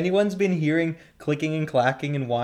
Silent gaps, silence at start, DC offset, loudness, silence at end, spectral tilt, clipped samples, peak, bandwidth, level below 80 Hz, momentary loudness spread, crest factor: none; 0 s; under 0.1%; -24 LUFS; 0 s; -7 dB/octave; under 0.1%; -8 dBFS; 12.5 kHz; -64 dBFS; 7 LU; 16 dB